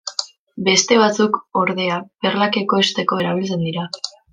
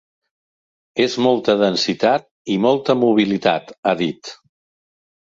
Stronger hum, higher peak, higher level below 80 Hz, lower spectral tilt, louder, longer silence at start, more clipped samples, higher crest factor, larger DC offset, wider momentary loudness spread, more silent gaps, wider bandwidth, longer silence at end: neither; about the same, -2 dBFS vs -2 dBFS; about the same, -64 dBFS vs -62 dBFS; second, -3.5 dB/octave vs -5 dB/octave; about the same, -18 LUFS vs -18 LUFS; second, 0.05 s vs 0.95 s; neither; about the same, 18 dB vs 16 dB; neither; first, 12 LU vs 8 LU; second, 0.38-0.47 s vs 2.31-2.45 s, 3.78-3.83 s; first, 9.8 kHz vs 7.8 kHz; second, 0.25 s vs 0.9 s